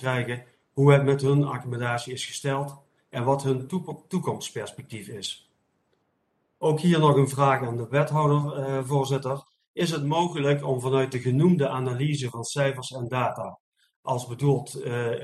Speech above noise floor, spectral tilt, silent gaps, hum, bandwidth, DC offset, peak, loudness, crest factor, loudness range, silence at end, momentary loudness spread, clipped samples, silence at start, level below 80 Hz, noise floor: 48 dB; -6.5 dB/octave; 9.68-9.74 s, 13.60-13.72 s, 13.96-14.03 s; none; 12.5 kHz; under 0.1%; -4 dBFS; -25 LUFS; 20 dB; 7 LU; 0 s; 14 LU; under 0.1%; 0 s; -64 dBFS; -72 dBFS